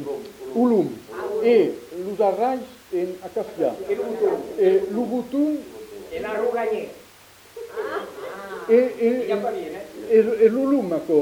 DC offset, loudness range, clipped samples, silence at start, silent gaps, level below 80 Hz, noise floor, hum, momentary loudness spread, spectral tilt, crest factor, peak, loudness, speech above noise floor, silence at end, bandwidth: under 0.1%; 6 LU; under 0.1%; 0 s; none; -62 dBFS; -49 dBFS; none; 15 LU; -6.5 dB/octave; 18 dB; -6 dBFS; -22 LUFS; 28 dB; 0 s; 16.5 kHz